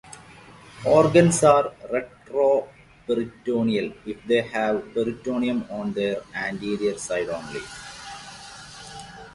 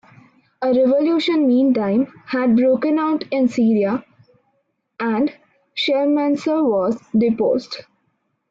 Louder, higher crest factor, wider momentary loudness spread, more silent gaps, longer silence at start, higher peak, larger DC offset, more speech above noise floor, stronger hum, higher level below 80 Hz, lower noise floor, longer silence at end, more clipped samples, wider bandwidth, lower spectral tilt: second, -23 LUFS vs -18 LUFS; first, 22 dB vs 10 dB; first, 22 LU vs 8 LU; neither; second, 0.05 s vs 0.6 s; first, -2 dBFS vs -8 dBFS; neither; second, 24 dB vs 52 dB; neither; first, -56 dBFS vs -62 dBFS; second, -47 dBFS vs -69 dBFS; second, 0.05 s vs 0.7 s; neither; first, 11.5 kHz vs 7.6 kHz; second, -5 dB/octave vs -6.5 dB/octave